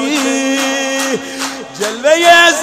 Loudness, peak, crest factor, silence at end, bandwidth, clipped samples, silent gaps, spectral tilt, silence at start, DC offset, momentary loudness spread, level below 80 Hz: -12 LUFS; 0 dBFS; 12 dB; 0 s; 16 kHz; 0.2%; none; -1 dB/octave; 0 s; under 0.1%; 14 LU; -54 dBFS